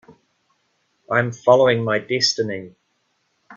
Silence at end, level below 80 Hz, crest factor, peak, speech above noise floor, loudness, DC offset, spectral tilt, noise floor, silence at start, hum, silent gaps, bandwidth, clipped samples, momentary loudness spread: 0 s; -64 dBFS; 20 dB; -2 dBFS; 50 dB; -18 LUFS; under 0.1%; -4 dB/octave; -69 dBFS; 1.1 s; none; none; 7.6 kHz; under 0.1%; 10 LU